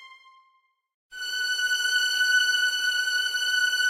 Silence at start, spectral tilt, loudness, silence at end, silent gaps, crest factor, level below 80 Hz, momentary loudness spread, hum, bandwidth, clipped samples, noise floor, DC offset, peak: 0 s; 5 dB/octave; -23 LUFS; 0 s; 0.94-1.09 s; 14 dB; -70 dBFS; 7 LU; none; 16 kHz; under 0.1%; -67 dBFS; under 0.1%; -12 dBFS